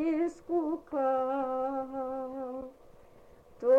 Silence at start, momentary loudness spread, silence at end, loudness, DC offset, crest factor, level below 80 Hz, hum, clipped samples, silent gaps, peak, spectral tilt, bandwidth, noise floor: 0 s; 10 LU; 0 s; -33 LUFS; under 0.1%; 16 dB; -64 dBFS; none; under 0.1%; none; -16 dBFS; -7 dB/octave; 8.2 kHz; -56 dBFS